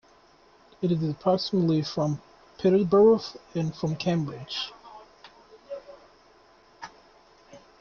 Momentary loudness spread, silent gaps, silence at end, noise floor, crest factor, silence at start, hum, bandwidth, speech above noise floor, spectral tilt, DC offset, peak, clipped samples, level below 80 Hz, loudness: 22 LU; none; 0.2 s; -58 dBFS; 18 dB; 0.8 s; none; 7 kHz; 33 dB; -7.5 dB/octave; under 0.1%; -10 dBFS; under 0.1%; -62 dBFS; -26 LUFS